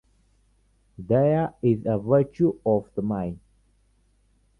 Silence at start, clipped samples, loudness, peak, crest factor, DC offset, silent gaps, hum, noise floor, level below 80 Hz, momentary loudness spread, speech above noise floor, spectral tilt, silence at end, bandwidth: 1 s; under 0.1%; -24 LUFS; -8 dBFS; 18 dB; under 0.1%; none; none; -64 dBFS; -54 dBFS; 11 LU; 41 dB; -11 dB/octave; 1.2 s; 6 kHz